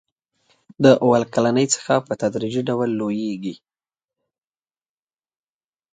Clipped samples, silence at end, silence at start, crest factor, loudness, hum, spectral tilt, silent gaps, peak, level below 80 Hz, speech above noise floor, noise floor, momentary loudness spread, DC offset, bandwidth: under 0.1%; 2.4 s; 0.8 s; 22 dB; -20 LUFS; none; -5 dB/octave; none; 0 dBFS; -64 dBFS; over 71 dB; under -90 dBFS; 10 LU; under 0.1%; 9.6 kHz